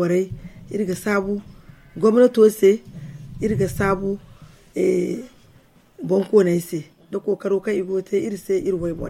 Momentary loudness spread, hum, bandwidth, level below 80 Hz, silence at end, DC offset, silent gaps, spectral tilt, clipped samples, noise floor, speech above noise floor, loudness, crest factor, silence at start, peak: 17 LU; none; 15.5 kHz; -46 dBFS; 0 s; under 0.1%; none; -7 dB/octave; under 0.1%; -53 dBFS; 33 dB; -21 LUFS; 18 dB; 0 s; -4 dBFS